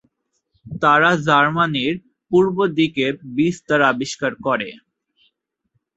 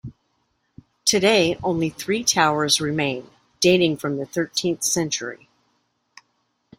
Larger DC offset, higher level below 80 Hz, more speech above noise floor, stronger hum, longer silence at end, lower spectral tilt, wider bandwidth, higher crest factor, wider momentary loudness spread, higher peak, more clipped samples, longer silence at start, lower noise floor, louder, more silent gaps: neither; about the same, -58 dBFS vs -58 dBFS; first, 53 dB vs 49 dB; neither; second, 1.2 s vs 1.45 s; first, -5.5 dB/octave vs -3 dB/octave; second, 8.2 kHz vs 16 kHz; about the same, 18 dB vs 20 dB; about the same, 9 LU vs 9 LU; about the same, -2 dBFS vs -2 dBFS; neither; first, 0.65 s vs 0.05 s; about the same, -71 dBFS vs -70 dBFS; about the same, -18 LUFS vs -20 LUFS; neither